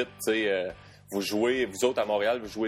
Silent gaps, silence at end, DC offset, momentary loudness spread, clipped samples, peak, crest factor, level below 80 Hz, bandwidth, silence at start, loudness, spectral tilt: none; 0 s; under 0.1%; 9 LU; under 0.1%; -10 dBFS; 18 dB; -62 dBFS; 16 kHz; 0 s; -28 LUFS; -3.5 dB/octave